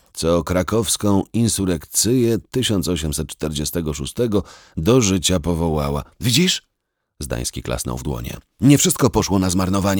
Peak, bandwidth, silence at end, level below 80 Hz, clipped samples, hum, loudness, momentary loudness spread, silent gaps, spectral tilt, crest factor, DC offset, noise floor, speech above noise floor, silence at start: -2 dBFS; over 20 kHz; 0 s; -36 dBFS; under 0.1%; none; -19 LUFS; 10 LU; none; -4.5 dB/octave; 18 dB; under 0.1%; -75 dBFS; 56 dB; 0.15 s